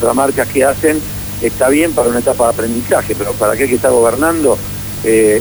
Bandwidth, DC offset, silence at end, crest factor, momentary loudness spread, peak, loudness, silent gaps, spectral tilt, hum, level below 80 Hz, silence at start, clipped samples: over 20 kHz; under 0.1%; 0 s; 12 dB; 7 LU; 0 dBFS; -13 LUFS; none; -4.5 dB/octave; 50 Hz at -30 dBFS; -36 dBFS; 0 s; under 0.1%